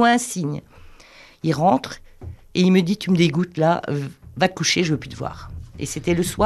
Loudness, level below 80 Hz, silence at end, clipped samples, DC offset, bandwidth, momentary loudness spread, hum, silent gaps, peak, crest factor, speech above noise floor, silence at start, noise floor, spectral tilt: -21 LUFS; -46 dBFS; 0 s; under 0.1%; under 0.1%; 13.5 kHz; 17 LU; none; none; -4 dBFS; 18 dB; 27 dB; 0 s; -47 dBFS; -5 dB/octave